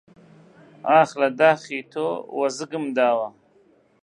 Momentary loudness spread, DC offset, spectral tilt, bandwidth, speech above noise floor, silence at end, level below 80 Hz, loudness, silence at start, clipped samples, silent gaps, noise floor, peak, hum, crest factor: 11 LU; under 0.1%; -4.5 dB/octave; 10.5 kHz; 37 dB; 0.75 s; -76 dBFS; -22 LUFS; 0.85 s; under 0.1%; none; -58 dBFS; -4 dBFS; none; 20 dB